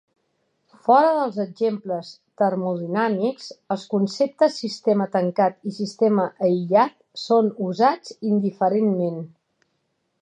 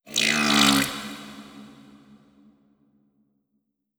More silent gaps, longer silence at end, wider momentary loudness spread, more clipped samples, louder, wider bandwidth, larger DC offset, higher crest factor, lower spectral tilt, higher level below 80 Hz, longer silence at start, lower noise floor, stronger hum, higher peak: neither; second, 0.95 s vs 2.3 s; second, 11 LU vs 25 LU; neither; about the same, -22 LUFS vs -20 LUFS; second, 9.4 kHz vs over 20 kHz; neither; second, 18 dB vs 24 dB; first, -7 dB/octave vs -2 dB/octave; second, -78 dBFS vs -58 dBFS; first, 0.85 s vs 0.05 s; about the same, -73 dBFS vs -76 dBFS; neither; about the same, -4 dBFS vs -2 dBFS